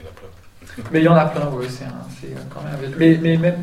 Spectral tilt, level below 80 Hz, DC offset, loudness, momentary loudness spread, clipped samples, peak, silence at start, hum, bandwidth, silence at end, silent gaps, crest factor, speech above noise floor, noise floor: -8 dB/octave; -48 dBFS; under 0.1%; -17 LUFS; 19 LU; under 0.1%; -2 dBFS; 0 s; none; 11.5 kHz; 0 s; none; 18 dB; 23 dB; -41 dBFS